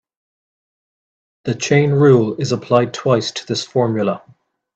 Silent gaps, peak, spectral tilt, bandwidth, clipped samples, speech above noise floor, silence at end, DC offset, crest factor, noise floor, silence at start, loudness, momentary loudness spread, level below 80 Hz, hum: none; 0 dBFS; -6 dB/octave; 8.4 kHz; under 0.1%; over 74 dB; 0.55 s; under 0.1%; 18 dB; under -90 dBFS; 1.45 s; -16 LUFS; 11 LU; -60 dBFS; none